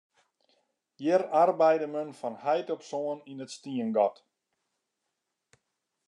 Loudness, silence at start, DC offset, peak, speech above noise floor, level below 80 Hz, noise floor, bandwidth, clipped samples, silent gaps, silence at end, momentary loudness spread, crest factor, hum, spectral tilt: -28 LUFS; 1 s; under 0.1%; -10 dBFS; 55 dB; under -90 dBFS; -83 dBFS; 10.5 kHz; under 0.1%; none; 1.95 s; 14 LU; 20 dB; none; -5.5 dB/octave